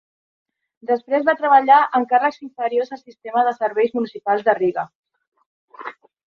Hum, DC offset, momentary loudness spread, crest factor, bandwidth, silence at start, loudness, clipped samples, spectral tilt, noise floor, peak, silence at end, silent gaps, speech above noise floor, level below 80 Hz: none; under 0.1%; 21 LU; 18 dB; 6.4 kHz; 0.85 s; -18 LUFS; under 0.1%; -6 dB/octave; -37 dBFS; -2 dBFS; 0.4 s; 4.95-5.03 s, 5.27-5.32 s, 5.46-5.68 s; 19 dB; -72 dBFS